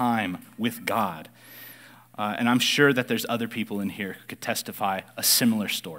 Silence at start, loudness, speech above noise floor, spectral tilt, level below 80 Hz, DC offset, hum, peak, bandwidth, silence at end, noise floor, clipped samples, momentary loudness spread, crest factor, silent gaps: 0 s; -25 LUFS; 23 dB; -3 dB/octave; -74 dBFS; under 0.1%; none; -6 dBFS; 16 kHz; 0 s; -49 dBFS; under 0.1%; 23 LU; 20 dB; none